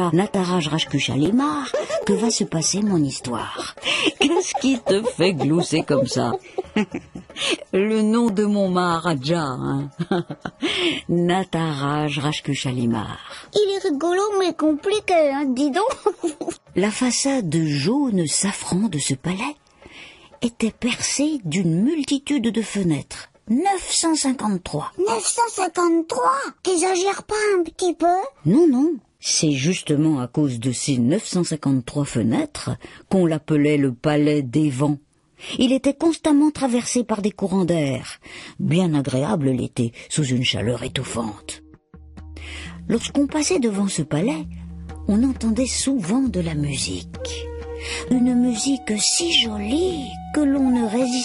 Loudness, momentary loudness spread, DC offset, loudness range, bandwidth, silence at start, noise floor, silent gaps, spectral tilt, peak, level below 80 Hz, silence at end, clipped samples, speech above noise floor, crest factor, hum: -21 LUFS; 10 LU; under 0.1%; 3 LU; 11.5 kHz; 0 s; -46 dBFS; none; -4.5 dB/octave; -4 dBFS; -48 dBFS; 0 s; under 0.1%; 25 dB; 18 dB; none